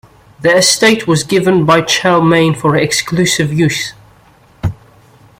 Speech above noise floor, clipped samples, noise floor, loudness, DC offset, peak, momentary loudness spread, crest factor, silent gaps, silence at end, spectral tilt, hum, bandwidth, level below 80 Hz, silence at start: 34 dB; under 0.1%; -45 dBFS; -11 LUFS; under 0.1%; 0 dBFS; 13 LU; 12 dB; none; 0.65 s; -4 dB/octave; none; 16.5 kHz; -42 dBFS; 0.4 s